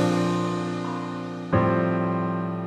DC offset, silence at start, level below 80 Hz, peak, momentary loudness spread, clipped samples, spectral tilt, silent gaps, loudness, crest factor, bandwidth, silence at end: under 0.1%; 0 s; -54 dBFS; -8 dBFS; 9 LU; under 0.1%; -7 dB/octave; none; -25 LUFS; 16 dB; 10.5 kHz; 0 s